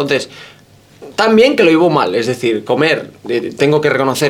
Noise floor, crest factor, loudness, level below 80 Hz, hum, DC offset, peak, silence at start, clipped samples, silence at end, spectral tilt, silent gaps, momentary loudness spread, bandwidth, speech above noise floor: -40 dBFS; 14 dB; -13 LUFS; -56 dBFS; none; under 0.1%; 0 dBFS; 0 s; under 0.1%; 0 s; -5 dB/octave; none; 10 LU; 16.5 kHz; 27 dB